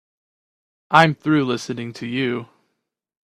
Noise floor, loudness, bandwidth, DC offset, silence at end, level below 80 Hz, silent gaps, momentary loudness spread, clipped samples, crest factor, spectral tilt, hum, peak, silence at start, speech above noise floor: -76 dBFS; -20 LUFS; 12.5 kHz; under 0.1%; 0.8 s; -62 dBFS; none; 14 LU; under 0.1%; 22 dB; -6 dB/octave; none; 0 dBFS; 0.9 s; 57 dB